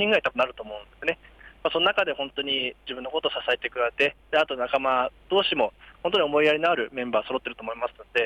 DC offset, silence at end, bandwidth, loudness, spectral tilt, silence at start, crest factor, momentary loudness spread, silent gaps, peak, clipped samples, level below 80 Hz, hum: under 0.1%; 0 s; 10 kHz; -25 LUFS; -4.5 dB/octave; 0 s; 16 dB; 10 LU; none; -10 dBFS; under 0.1%; -58 dBFS; none